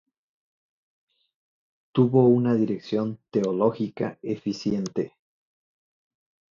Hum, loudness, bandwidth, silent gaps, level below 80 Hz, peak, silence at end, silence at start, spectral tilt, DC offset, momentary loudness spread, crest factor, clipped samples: none; -24 LUFS; 7.4 kHz; none; -64 dBFS; -8 dBFS; 1.45 s; 1.95 s; -8 dB/octave; under 0.1%; 12 LU; 20 dB; under 0.1%